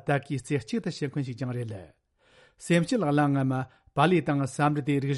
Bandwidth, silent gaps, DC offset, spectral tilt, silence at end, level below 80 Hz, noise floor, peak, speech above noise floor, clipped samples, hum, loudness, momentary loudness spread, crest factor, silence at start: 11.5 kHz; none; under 0.1%; -6.5 dB/octave; 0 s; -62 dBFS; -61 dBFS; -10 dBFS; 34 dB; under 0.1%; none; -27 LUFS; 10 LU; 18 dB; 0.05 s